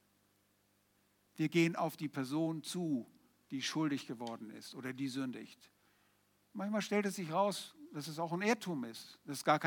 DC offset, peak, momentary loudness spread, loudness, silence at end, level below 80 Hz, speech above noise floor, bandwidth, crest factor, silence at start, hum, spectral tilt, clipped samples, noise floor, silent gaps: under 0.1%; -16 dBFS; 13 LU; -38 LUFS; 0 s; under -90 dBFS; 37 dB; 19 kHz; 24 dB; 1.35 s; 50 Hz at -75 dBFS; -5 dB/octave; under 0.1%; -75 dBFS; none